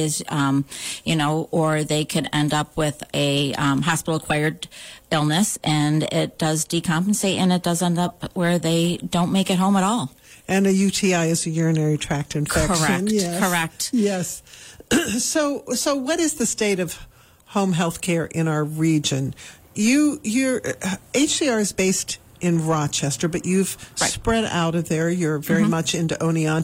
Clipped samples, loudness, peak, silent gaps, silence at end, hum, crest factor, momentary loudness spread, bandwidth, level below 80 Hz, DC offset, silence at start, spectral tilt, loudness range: under 0.1%; -21 LUFS; -6 dBFS; none; 0 s; none; 14 dB; 6 LU; 16 kHz; -46 dBFS; under 0.1%; 0 s; -4.5 dB/octave; 2 LU